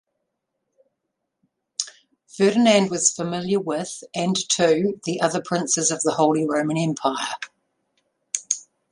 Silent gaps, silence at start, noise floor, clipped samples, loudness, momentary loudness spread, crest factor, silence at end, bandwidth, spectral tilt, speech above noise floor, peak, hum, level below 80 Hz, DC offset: none; 1.8 s; -79 dBFS; under 0.1%; -22 LUFS; 12 LU; 20 dB; 0.3 s; 11.5 kHz; -3.5 dB/octave; 58 dB; -4 dBFS; none; -68 dBFS; under 0.1%